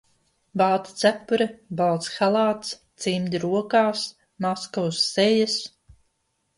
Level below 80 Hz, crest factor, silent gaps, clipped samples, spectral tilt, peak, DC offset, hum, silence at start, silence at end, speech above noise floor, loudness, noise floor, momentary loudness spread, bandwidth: -64 dBFS; 20 dB; none; under 0.1%; -4.5 dB/octave; -4 dBFS; under 0.1%; none; 0.55 s; 0.9 s; 50 dB; -23 LUFS; -73 dBFS; 10 LU; 11.5 kHz